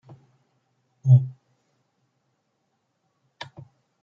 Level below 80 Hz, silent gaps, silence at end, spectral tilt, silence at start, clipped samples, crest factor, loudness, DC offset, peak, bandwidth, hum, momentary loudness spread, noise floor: -72 dBFS; none; 2.7 s; -9 dB/octave; 1.05 s; under 0.1%; 22 dB; -20 LUFS; under 0.1%; -6 dBFS; 5.6 kHz; none; 23 LU; -74 dBFS